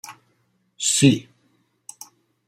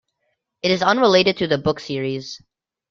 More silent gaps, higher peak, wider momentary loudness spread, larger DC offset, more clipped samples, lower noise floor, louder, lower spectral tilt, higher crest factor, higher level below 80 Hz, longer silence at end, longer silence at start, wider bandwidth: neither; about the same, -4 dBFS vs -2 dBFS; first, 27 LU vs 15 LU; neither; neither; second, -67 dBFS vs -73 dBFS; about the same, -19 LUFS vs -19 LUFS; about the same, -4 dB/octave vs -5 dB/octave; about the same, 22 dB vs 20 dB; second, -64 dBFS vs -56 dBFS; first, 1.25 s vs 0.55 s; second, 0.05 s vs 0.65 s; first, 16 kHz vs 7.4 kHz